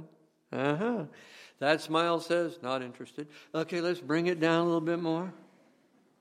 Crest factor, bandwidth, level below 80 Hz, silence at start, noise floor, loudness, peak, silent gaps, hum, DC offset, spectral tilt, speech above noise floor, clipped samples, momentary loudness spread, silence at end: 22 dB; 13 kHz; -82 dBFS; 0 s; -66 dBFS; -31 LUFS; -10 dBFS; none; none; under 0.1%; -6 dB/octave; 35 dB; under 0.1%; 16 LU; 0.85 s